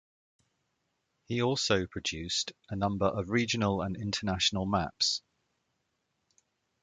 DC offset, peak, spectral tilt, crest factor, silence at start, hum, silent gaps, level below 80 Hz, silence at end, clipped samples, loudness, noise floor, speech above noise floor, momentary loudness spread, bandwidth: under 0.1%; -12 dBFS; -4 dB/octave; 22 dB; 1.3 s; none; none; -54 dBFS; 1.65 s; under 0.1%; -30 LUFS; -80 dBFS; 49 dB; 6 LU; 9.6 kHz